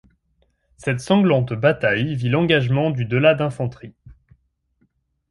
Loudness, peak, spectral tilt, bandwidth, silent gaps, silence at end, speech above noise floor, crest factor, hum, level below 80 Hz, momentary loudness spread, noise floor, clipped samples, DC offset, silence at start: -19 LUFS; -4 dBFS; -7 dB/octave; 11.5 kHz; none; 1.2 s; 47 dB; 18 dB; none; -52 dBFS; 9 LU; -66 dBFS; under 0.1%; under 0.1%; 0.8 s